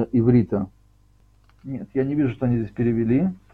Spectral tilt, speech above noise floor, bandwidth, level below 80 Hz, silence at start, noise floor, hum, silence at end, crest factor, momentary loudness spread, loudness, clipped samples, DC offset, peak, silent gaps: -11.5 dB/octave; 35 dB; 4.4 kHz; -48 dBFS; 0 s; -57 dBFS; 50 Hz at -50 dBFS; 0.15 s; 16 dB; 16 LU; -22 LUFS; under 0.1%; under 0.1%; -6 dBFS; none